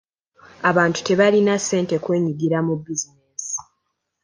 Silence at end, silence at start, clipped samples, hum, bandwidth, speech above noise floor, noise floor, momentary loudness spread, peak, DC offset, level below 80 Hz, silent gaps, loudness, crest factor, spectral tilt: 0.6 s; 0.6 s; under 0.1%; none; 10.5 kHz; 56 dB; -75 dBFS; 12 LU; -2 dBFS; under 0.1%; -62 dBFS; none; -20 LUFS; 18 dB; -4.5 dB/octave